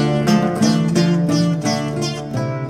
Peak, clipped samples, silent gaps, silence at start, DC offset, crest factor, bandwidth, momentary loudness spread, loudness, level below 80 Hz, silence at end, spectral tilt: -2 dBFS; under 0.1%; none; 0 s; under 0.1%; 14 dB; 14 kHz; 7 LU; -18 LUFS; -48 dBFS; 0 s; -6 dB/octave